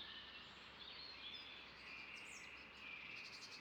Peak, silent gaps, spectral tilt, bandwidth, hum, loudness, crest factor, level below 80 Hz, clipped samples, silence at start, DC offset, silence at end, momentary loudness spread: -42 dBFS; none; -1.5 dB/octave; 18 kHz; none; -53 LUFS; 14 dB; -78 dBFS; under 0.1%; 0 s; under 0.1%; 0 s; 4 LU